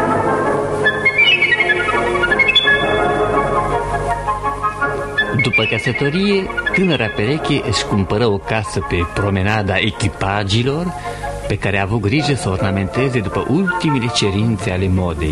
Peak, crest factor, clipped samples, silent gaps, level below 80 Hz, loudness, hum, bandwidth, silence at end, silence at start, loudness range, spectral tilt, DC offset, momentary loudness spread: -2 dBFS; 16 dB; under 0.1%; none; -34 dBFS; -16 LUFS; none; 12 kHz; 0 s; 0 s; 5 LU; -5 dB/octave; under 0.1%; 8 LU